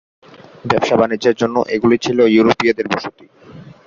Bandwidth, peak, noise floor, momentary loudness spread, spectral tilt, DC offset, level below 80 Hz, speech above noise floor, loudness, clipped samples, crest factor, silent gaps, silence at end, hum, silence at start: 7.6 kHz; 0 dBFS; -39 dBFS; 10 LU; -5.5 dB/octave; under 0.1%; -52 dBFS; 24 dB; -15 LUFS; under 0.1%; 16 dB; none; 0.25 s; none; 0.65 s